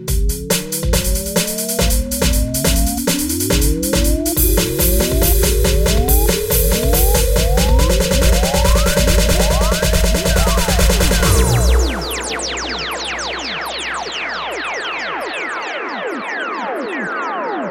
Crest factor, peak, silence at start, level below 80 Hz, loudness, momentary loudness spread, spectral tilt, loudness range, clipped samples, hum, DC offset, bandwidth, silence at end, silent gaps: 14 dB; 0 dBFS; 0 s; -18 dBFS; -16 LUFS; 8 LU; -4 dB/octave; 7 LU; under 0.1%; none; under 0.1%; 17 kHz; 0 s; none